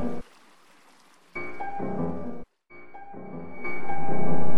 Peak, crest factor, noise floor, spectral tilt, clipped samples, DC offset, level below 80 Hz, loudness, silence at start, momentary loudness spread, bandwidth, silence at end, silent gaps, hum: -8 dBFS; 12 dB; -58 dBFS; -8.5 dB/octave; under 0.1%; under 0.1%; -56 dBFS; -34 LUFS; 0 s; 17 LU; 12 kHz; 0 s; none; none